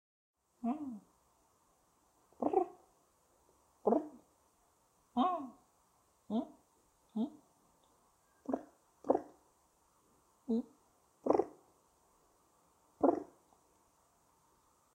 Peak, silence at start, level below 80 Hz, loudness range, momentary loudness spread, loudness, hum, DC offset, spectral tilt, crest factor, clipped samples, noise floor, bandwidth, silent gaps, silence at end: -14 dBFS; 0.65 s; -78 dBFS; 4 LU; 18 LU; -38 LUFS; none; under 0.1%; -7.5 dB/octave; 26 dB; under 0.1%; -73 dBFS; 15 kHz; none; 1.7 s